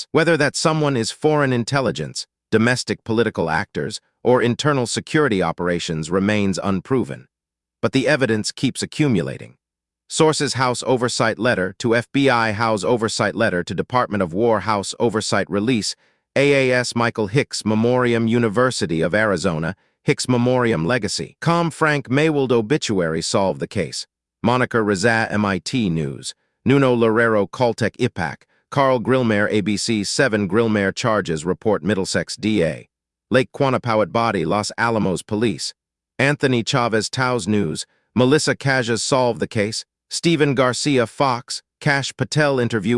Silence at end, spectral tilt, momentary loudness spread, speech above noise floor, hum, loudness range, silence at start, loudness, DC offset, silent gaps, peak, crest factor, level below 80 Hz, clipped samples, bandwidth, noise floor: 0 s; -5 dB/octave; 8 LU; 67 dB; none; 2 LU; 0 s; -19 LUFS; under 0.1%; none; -2 dBFS; 18 dB; -56 dBFS; under 0.1%; 12 kHz; -86 dBFS